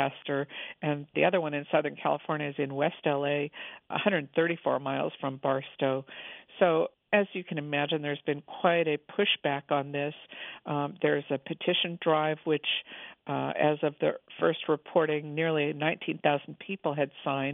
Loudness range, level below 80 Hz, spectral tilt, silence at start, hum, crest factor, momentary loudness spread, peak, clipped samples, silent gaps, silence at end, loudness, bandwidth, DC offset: 1 LU; -80 dBFS; -9 dB/octave; 0 s; none; 22 dB; 8 LU; -8 dBFS; under 0.1%; none; 0 s; -30 LUFS; 3.9 kHz; under 0.1%